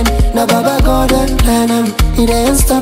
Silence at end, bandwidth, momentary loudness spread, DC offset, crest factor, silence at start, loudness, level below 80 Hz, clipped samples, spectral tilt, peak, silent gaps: 0 s; 16.5 kHz; 2 LU; under 0.1%; 10 dB; 0 s; -12 LUFS; -14 dBFS; under 0.1%; -5 dB/octave; 0 dBFS; none